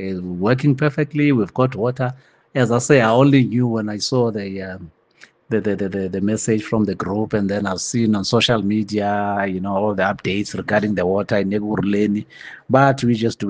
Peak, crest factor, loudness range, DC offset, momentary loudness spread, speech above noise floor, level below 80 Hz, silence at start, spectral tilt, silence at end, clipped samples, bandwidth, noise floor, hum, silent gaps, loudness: 0 dBFS; 18 dB; 5 LU; under 0.1%; 9 LU; 32 dB; -56 dBFS; 0 s; -6 dB/octave; 0 s; under 0.1%; 9.8 kHz; -50 dBFS; none; none; -19 LUFS